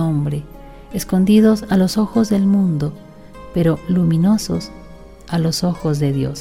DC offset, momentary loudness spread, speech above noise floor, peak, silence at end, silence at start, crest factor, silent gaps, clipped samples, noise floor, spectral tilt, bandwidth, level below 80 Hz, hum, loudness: under 0.1%; 12 LU; 22 dB; -2 dBFS; 0 s; 0 s; 14 dB; none; under 0.1%; -38 dBFS; -7 dB/octave; 16 kHz; -40 dBFS; none; -17 LUFS